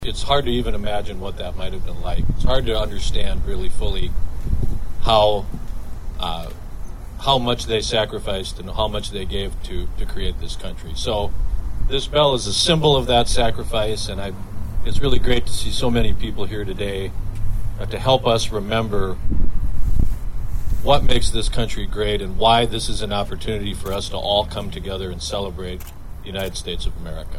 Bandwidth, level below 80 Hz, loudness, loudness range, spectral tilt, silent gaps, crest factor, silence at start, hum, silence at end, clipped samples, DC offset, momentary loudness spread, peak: 13.5 kHz; -24 dBFS; -22 LUFS; 6 LU; -4.5 dB/octave; none; 16 dB; 0 s; none; 0 s; under 0.1%; under 0.1%; 14 LU; -2 dBFS